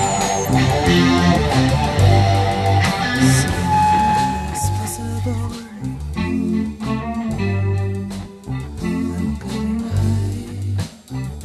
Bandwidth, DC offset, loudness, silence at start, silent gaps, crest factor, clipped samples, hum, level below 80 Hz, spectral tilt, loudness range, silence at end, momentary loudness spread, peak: 13.5 kHz; under 0.1%; -19 LUFS; 0 s; none; 16 dB; under 0.1%; none; -30 dBFS; -5.5 dB/octave; 8 LU; 0 s; 13 LU; -2 dBFS